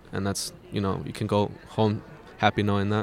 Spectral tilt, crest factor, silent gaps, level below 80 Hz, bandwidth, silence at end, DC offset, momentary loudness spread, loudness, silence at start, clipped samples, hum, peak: -5.5 dB/octave; 22 dB; none; -56 dBFS; 15 kHz; 0 s; under 0.1%; 8 LU; -27 LUFS; 0.05 s; under 0.1%; none; -4 dBFS